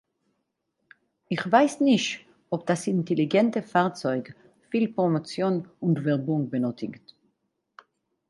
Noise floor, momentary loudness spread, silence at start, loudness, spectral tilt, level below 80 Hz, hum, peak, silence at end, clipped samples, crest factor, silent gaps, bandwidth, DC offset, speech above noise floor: -78 dBFS; 11 LU; 1.3 s; -25 LUFS; -6 dB/octave; -74 dBFS; none; -6 dBFS; 1.3 s; under 0.1%; 22 dB; none; 11.5 kHz; under 0.1%; 53 dB